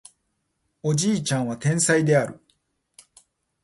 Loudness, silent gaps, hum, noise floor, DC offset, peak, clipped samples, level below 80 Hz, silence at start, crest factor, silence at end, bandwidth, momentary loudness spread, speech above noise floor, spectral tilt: -22 LUFS; none; none; -74 dBFS; under 0.1%; -8 dBFS; under 0.1%; -62 dBFS; 0.85 s; 18 dB; 1.25 s; 11.5 kHz; 8 LU; 53 dB; -4.5 dB/octave